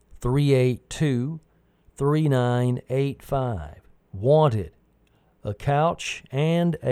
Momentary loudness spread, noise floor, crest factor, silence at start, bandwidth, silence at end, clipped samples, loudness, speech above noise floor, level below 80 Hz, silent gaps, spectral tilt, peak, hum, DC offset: 15 LU; -62 dBFS; 16 dB; 0.2 s; 13.5 kHz; 0 s; under 0.1%; -23 LUFS; 39 dB; -46 dBFS; none; -7 dB/octave; -8 dBFS; none; under 0.1%